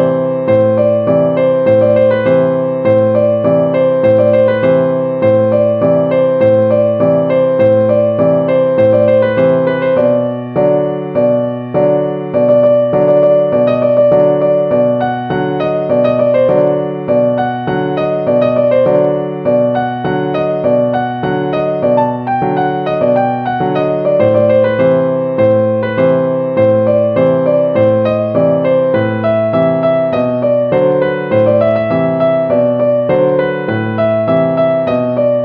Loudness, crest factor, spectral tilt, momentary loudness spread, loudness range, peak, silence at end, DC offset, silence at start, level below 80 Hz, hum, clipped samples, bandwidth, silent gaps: -12 LUFS; 10 dB; -10.5 dB/octave; 5 LU; 3 LU; 0 dBFS; 0 s; under 0.1%; 0 s; -50 dBFS; none; under 0.1%; 4.8 kHz; none